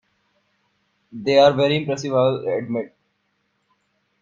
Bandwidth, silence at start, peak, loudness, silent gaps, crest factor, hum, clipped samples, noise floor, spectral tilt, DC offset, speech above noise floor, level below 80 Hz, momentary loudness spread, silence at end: 7.4 kHz; 1.15 s; -2 dBFS; -19 LUFS; none; 20 dB; none; under 0.1%; -70 dBFS; -6 dB/octave; under 0.1%; 51 dB; -62 dBFS; 13 LU; 1.35 s